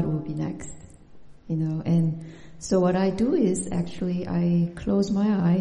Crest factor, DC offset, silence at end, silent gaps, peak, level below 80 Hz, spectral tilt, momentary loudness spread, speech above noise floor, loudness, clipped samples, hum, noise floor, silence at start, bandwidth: 14 dB; under 0.1%; 0 s; none; -10 dBFS; -48 dBFS; -7.5 dB/octave; 12 LU; 23 dB; -25 LUFS; under 0.1%; none; -47 dBFS; 0 s; 11 kHz